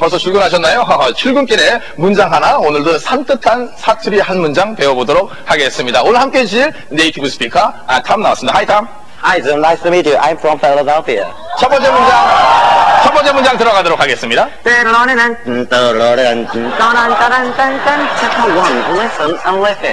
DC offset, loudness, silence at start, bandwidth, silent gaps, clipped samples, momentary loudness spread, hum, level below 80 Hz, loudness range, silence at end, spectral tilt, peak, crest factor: 4%; -10 LUFS; 0 s; 11 kHz; none; under 0.1%; 6 LU; none; -42 dBFS; 4 LU; 0 s; -3.5 dB/octave; 0 dBFS; 10 dB